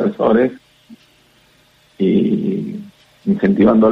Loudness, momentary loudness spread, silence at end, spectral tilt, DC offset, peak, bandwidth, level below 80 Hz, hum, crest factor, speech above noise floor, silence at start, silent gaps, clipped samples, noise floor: -16 LUFS; 13 LU; 0 s; -9.5 dB/octave; under 0.1%; -2 dBFS; 5.2 kHz; -52 dBFS; none; 14 dB; 39 dB; 0 s; none; under 0.1%; -53 dBFS